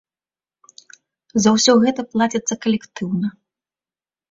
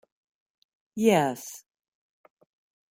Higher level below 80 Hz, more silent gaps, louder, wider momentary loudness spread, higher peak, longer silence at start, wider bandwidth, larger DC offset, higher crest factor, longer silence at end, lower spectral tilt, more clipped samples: first, -60 dBFS vs -74 dBFS; neither; first, -18 LUFS vs -24 LUFS; second, 11 LU vs 20 LU; first, -2 dBFS vs -8 dBFS; first, 1.35 s vs 0.95 s; second, 7.8 kHz vs 16 kHz; neither; about the same, 18 dB vs 22 dB; second, 1 s vs 1.35 s; about the same, -4 dB/octave vs -5 dB/octave; neither